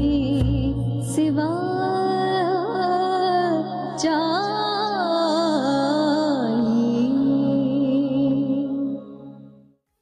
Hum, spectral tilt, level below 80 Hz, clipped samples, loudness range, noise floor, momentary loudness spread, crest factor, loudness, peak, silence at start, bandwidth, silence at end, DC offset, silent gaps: none; -6.5 dB/octave; -40 dBFS; under 0.1%; 2 LU; -53 dBFS; 4 LU; 10 dB; -22 LUFS; -12 dBFS; 0 s; 12 kHz; 0.5 s; under 0.1%; none